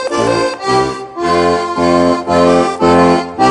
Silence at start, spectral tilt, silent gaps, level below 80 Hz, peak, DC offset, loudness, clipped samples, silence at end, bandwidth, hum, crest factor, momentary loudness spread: 0 s; -5.5 dB/octave; none; -42 dBFS; 0 dBFS; under 0.1%; -12 LUFS; under 0.1%; 0 s; 10.5 kHz; none; 12 dB; 5 LU